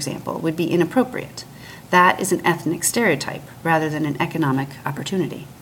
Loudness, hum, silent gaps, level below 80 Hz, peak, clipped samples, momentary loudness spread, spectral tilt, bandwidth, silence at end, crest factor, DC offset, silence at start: -21 LUFS; none; none; -56 dBFS; -2 dBFS; under 0.1%; 13 LU; -4.5 dB/octave; 18 kHz; 0 s; 20 dB; under 0.1%; 0 s